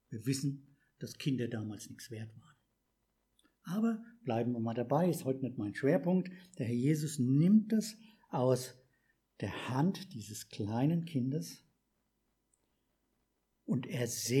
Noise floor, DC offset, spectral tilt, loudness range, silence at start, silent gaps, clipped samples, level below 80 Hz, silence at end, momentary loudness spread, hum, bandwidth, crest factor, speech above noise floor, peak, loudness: -80 dBFS; under 0.1%; -6.5 dB/octave; 9 LU; 0.1 s; none; under 0.1%; -78 dBFS; 0 s; 16 LU; none; 16 kHz; 20 dB; 47 dB; -16 dBFS; -34 LUFS